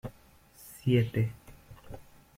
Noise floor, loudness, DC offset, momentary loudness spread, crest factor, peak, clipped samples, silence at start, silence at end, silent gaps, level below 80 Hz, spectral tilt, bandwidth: -58 dBFS; -30 LUFS; under 0.1%; 24 LU; 20 dB; -12 dBFS; under 0.1%; 0.05 s; 0.35 s; none; -56 dBFS; -7.5 dB/octave; 16 kHz